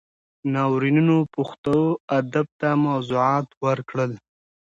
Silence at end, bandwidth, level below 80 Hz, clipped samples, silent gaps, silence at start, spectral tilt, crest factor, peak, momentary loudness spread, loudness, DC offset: 0.5 s; 7.8 kHz; -62 dBFS; under 0.1%; 1.58-1.64 s, 2.00-2.08 s, 2.52-2.59 s, 3.57-3.61 s; 0.45 s; -8 dB/octave; 14 dB; -8 dBFS; 8 LU; -22 LUFS; under 0.1%